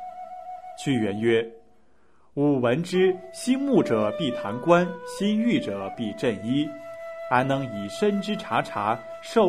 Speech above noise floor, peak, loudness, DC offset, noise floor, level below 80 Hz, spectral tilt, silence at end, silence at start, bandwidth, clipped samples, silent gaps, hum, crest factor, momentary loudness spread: 39 dB; -4 dBFS; -25 LUFS; 0.2%; -63 dBFS; -62 dBFS; -6 dB/octave; 0 s; 0 s; 14 kHz; under 0.1%; none; none; 20 dB; 15 LU